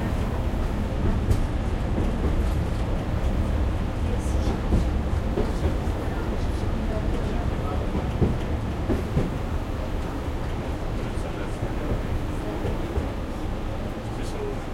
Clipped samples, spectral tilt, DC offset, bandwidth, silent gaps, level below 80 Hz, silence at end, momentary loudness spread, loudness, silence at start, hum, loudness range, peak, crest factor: under 0.1%; -7.5 dB/octave; under 0.1%; 14 kHz; none; -28 dBFS; 0 s; 6 LU; -28 LUFS; 0 s; none; 4 LU; -8 dBFS; 16 dB